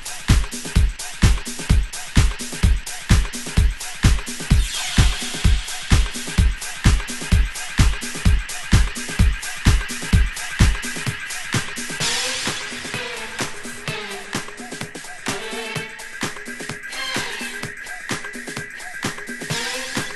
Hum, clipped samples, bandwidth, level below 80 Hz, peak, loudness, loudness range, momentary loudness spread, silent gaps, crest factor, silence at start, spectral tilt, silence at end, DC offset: none; under 0.1%; 12.5 kHz; -24 dBFS; 0 dBFS; -23 LUFS; 7 LU; 9 LU; none; 20 dB; 0 s; -4 dB/octave; 0 s; under 0.1%